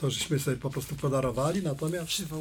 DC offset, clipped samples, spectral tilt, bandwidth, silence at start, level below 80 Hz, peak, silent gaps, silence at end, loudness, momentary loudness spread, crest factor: under 0.1%; under 0.1%; -5 dB/octave; 19 kHz; 0 s; -52 dBFS; -16 dBFS; none; 0 s; -30 LUFS; 4 LU; 14 dB